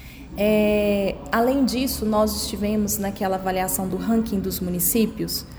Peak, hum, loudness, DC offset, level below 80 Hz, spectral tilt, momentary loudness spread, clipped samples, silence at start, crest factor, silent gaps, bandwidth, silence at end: -8 dBFS; none; -22 LUFS; under 0.1%; -40 dBFS; -4.5 dB/octave; 5 LU; under 0.1%; 0 s; 16 dB; none; over 20 kHz; 0 s